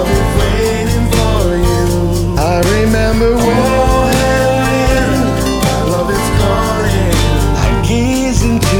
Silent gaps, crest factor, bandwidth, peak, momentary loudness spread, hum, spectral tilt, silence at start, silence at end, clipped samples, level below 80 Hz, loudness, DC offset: none; 12 dB; 19 kHz; 0 dBFS; 3 LU; none; -5.5 dB/octave; 0 s; 0 s; under 0.1%; -18 dBFS; -12 LUFS; under 0.1%